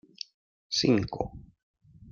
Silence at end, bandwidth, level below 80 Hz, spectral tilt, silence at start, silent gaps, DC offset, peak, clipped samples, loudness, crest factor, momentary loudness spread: 0 s; 7.4 kHz; -54 dBFS; -5 dB/octave; 0.7 s; 1.63-1.74 s; under 0.1%; -12 dBFS; under 0.1%; -28 LUFS; 20 dB; 18 LU